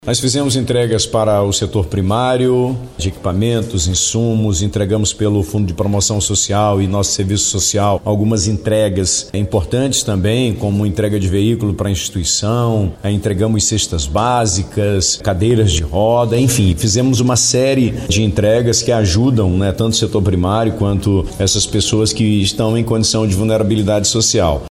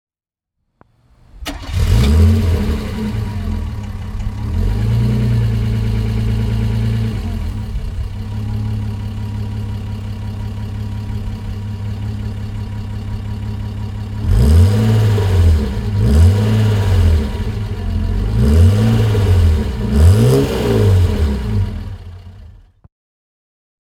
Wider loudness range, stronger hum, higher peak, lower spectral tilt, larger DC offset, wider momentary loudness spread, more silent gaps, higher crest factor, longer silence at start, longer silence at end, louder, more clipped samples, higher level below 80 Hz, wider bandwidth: second, 2 LU vs 11 LU; neither; second, -4 dBFS vs 0 dBFS; second, -4.5 dB/octave vs -7.5 dB/octave; neither; second, 4 LU vs 14 LU; neither; about the same, 12 dB vs 16 dB; second, 0.05 s vs 1.35 s; second, 0 s vs 1.3 s; first, -14 LUFS vs -17 LUFS; neither; second, -32 dBFS vs -22 dBFS; about the same, 15.5 kHz vs 15 kHz